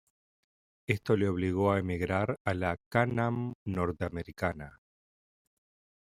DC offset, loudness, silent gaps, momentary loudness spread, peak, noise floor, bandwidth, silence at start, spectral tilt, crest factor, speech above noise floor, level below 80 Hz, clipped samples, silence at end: under 0.1%; -31 LUFS; 2.40-2.45 s, 2.86-2.91 s, 3.55-3.66 s; 8 LU; -10 dBFS; under -90 dBFS; 15 kHz; 0.9 s; -7.5 dB/octave; 22 dB; over 59 dB; -60 dBFS; under 0.1%; 1.35 s